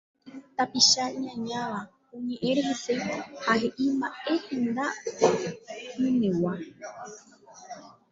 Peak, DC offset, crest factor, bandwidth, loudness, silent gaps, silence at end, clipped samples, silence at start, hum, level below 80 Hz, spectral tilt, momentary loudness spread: -6 dBFS; under 0.1%; 22 dB; 7.8 kHz; -27 LUFS; none; 0.2 s; under 0.1%; 0.25 s; none; -68 dBFS; -3 dB/octave; 20 LU